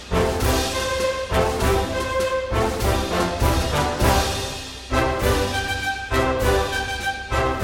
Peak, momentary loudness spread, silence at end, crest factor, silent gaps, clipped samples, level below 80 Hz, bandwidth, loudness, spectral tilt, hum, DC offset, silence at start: -4 dBFS; 4 LU; 0 s; 16 dB; none; under 0.1%; -28 dBFS; 17.5 kHz; -22 LUFS; -4.5 dB/octave; none; under 0.1%; 0 s